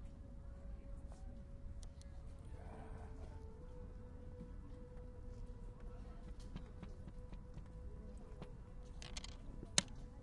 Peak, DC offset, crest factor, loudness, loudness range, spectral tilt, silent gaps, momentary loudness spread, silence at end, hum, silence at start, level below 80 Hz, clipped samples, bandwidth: -14 dBFS; under 0.1%; 36 dB; -51 LUFS; 9 LU; -3 dB/octave; none; 5 LU; 0 s; none; 0 s; -52 dBFS; under 0.1%; 11 kHz